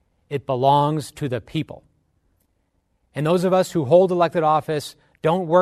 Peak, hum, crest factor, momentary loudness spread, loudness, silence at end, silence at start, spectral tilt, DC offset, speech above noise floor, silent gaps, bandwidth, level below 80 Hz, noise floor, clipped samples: -2 dBFS; none; 18 dB; 14 LU; -20 LUFS; 0 s; 0.3 s; -6.5 dB/octave; under 0.1%; 49 dB; none; 13.5 kHz; -58 dBFS; -68 dBFS; under 0.1%